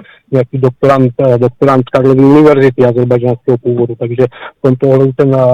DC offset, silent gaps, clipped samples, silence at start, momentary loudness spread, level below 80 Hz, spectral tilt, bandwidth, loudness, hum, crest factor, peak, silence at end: under 0.1%; none; under 0.1%; 0.3 s; 8 LU; -44 dBFS; -9.5 dB/octave; 7.4 kHz; -10 LUFS; none; 8 dB; 0 dBFS; 0 s